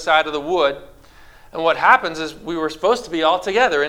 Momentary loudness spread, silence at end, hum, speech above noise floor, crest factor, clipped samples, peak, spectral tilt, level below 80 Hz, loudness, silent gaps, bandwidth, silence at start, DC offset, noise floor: 12 LU; 0 s; none; 27 dB; 18 dB; under 0.1%; 0 dBFS; -3.5 dB/octave; -50 dBFS; -18 LUFS; none; 16 kHz; 0 s; under 0.1%; -45 dBFS